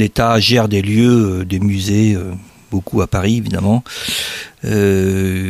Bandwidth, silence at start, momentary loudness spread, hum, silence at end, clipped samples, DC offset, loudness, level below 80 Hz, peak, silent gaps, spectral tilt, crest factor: 15 kHz; 0 s; 11 LU; none; 0 s; under 0.1%; under 0.1%; -15 LUFS; -38 dBFS; -2 dBFS; none; -5.5 dB/octave; 14 dB